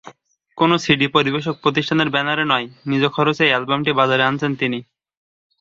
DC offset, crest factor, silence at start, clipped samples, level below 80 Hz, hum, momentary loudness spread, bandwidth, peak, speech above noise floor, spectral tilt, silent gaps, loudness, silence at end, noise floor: under 0.1%; 18 dB; 0.05 s; under 0.1%; -58 dBFS; none; 5 LU; 7.8 kHz; 0 dBFS; 30 dB; -5.5 dB/octave; none; -18 LUFS; 0.8 s; -48 dBFS